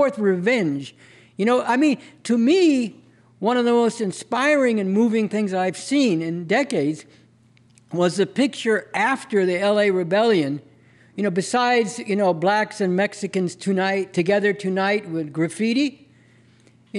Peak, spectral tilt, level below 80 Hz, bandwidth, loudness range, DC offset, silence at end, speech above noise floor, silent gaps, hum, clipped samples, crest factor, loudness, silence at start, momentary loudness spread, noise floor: -8 dBFS; -5.5 dB/octave; -72 dBFS; 11.5 kHz; 3 LU; under 0.1%; 0 s; 35 dB; none; none; under 0.1%; 12 dB; -21 LUFS; 0 s; 8 LU; -55 dBFS